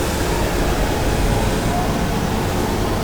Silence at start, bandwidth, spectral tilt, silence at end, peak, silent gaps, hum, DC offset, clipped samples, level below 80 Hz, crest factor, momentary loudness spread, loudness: 0 s; over 20 kHz; -5 dB/octave; 0 s; -6 dBFS; none; none; under 0.1%; under 0.1%; -24 dBFS; 14 dB; 1 LU; -20 LUFS